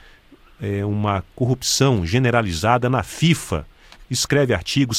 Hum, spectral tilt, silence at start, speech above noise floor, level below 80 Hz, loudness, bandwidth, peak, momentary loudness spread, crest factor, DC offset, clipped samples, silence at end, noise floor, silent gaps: none; -4.5 dB/octave; 0.6 s; 30 dB; -42 dBFS; -20 LUFS; 16 kHz; -2 dBFS; 9 LU; 18 dB; under 0.1%; under 0.1%; 0 s; -49 dBFS; none